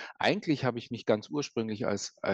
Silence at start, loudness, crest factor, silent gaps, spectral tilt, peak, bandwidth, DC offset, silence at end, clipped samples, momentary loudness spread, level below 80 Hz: 0 s; -31 LUFS; 20 dB; none; -5 dB/octave; -12 dBFS; 8.6 kHz; under 0.1%; 0 s; under 0.1%; 5 LU; -72 dBFS